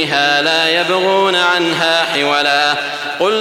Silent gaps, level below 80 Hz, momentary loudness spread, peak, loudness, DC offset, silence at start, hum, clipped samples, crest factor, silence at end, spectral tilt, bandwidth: none; -62 dBFS; 4 LU; -2 dBFS; -13 LUFS; under 0.1%; 0 s; none; under 0.1%; 12 dB; 0 s; -2.5 dB/octave; 16.5 kHz